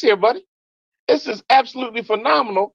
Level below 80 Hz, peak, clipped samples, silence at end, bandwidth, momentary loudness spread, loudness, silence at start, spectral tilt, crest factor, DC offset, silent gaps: -70 dBFS; -2 dBFS; under 0.1%; 0.05 s; 7.4 kHz; 10 LU; -18 LUFS; 0 s; -4 dB/octave; 16 dB; under 0.1%; 0.48-0.92 s, 0.99-1.07 s